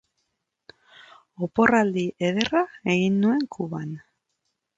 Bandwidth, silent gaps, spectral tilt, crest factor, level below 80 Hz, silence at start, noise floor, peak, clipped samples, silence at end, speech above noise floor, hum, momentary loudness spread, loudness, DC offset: 7.8 kHz; none; -6 dB/octave; 24 dB; -62 dBFS; 1.4 s; -78 dBFS; -2 dBFS; under 0.1%; 0.8 s; 55 dB; none; 14 LU; -23 LUFS; under 0.1%